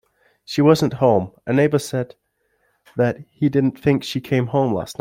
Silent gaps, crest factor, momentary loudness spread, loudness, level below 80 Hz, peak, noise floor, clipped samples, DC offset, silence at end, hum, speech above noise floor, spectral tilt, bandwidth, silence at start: none; 18 dB; 10 LU; -19 LUFS; -56 dBFS; -2 dBFS; -67 dBFS; under 0.1%; under 0.1%; 0.05 s; none; 48 dB; -7 dB/octave; 16.5 kHz; 0.5 s